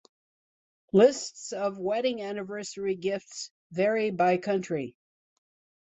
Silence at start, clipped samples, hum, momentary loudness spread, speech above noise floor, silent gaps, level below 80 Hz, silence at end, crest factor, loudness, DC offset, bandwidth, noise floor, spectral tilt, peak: 0.95 s; under 0.1%; none; 15 LU; over 63 dB; 3.51-3.70 s; -72 dBFS; 0.95 s; 20 dB; -28 LUFS; under 0.1%; 8.4 kHz; under -90 dBFS; -5 dB/octave; -8 dBFS